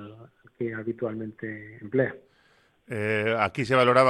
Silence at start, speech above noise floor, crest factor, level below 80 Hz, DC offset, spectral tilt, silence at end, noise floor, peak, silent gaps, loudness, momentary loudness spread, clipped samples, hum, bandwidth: 0 s; 38 dB; 22 dB; -66 dBFS; under 0.1%; -6.5 dB/octave; 0 s; -63 dBFS; -6 dBFS; none; -27 LUFS; 15 LU; under 0.1%; none; 12.5 kHz